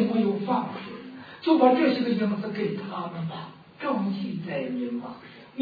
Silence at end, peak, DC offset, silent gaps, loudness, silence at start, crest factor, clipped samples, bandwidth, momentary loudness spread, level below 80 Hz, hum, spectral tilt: 0 s; -6 dBFS; under 0.1%; none; -26 LUFS; 0 s; 20 dB; under 0.1%; 5 kHz; 20 LU; -72 dBFS; none; -9 dB/octave